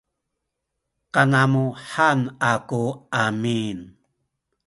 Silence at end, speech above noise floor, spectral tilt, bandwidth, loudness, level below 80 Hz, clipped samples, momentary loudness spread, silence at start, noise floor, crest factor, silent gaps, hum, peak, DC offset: 0.8 s; 59 dB; -6 dB/octave; 11.5 kHz; -21 LUFS; -60 dBFS; under 0.1%; 9 LU; 1.15 s; -80 dBFS; 20 dB; none; none; -2 dBFS; under 0.1%